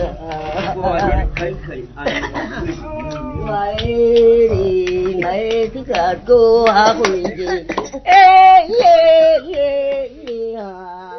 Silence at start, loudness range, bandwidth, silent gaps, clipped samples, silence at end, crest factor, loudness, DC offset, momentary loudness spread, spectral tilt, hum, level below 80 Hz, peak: 0 s; 11 LU; 6.4 kHz; none; under 0.1%; 0 s; 14 dB; -13 LUFS; under 0.1%; 17 LU; -5.5 dB/octave; none; -32 dBFS; 0 dBFS